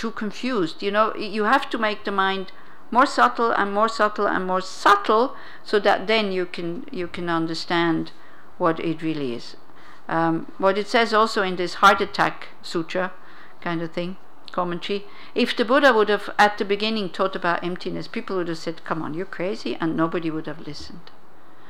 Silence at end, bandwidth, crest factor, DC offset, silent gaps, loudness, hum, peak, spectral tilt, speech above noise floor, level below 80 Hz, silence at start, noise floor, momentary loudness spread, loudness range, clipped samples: 0.7 s; 16.5 kHz; 18 dB; 2%; none; -22 LUFS; none; -6 dBFS; -5 dB/octave; 28 dB; -62 dBFS; 0 s; -51 dBFS; 13 LU; 7 LU; under 0.1%